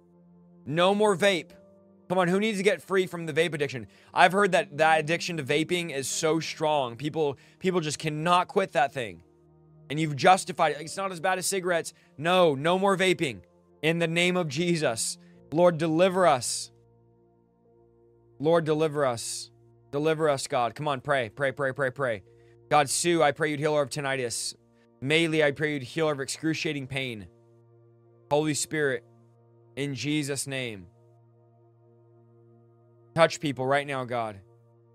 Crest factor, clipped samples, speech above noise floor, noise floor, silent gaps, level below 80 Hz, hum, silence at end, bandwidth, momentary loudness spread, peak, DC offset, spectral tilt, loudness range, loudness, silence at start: 26 dB; under 0.1%; 37 dB; -63 dBFS; none; -68 dBFS; none; 0.55 s; 16 kHz; 10 LU; -2 dBFS; under 0.1%; -4 dB/octave; 6 LU; -26 LUFS; 0.65 s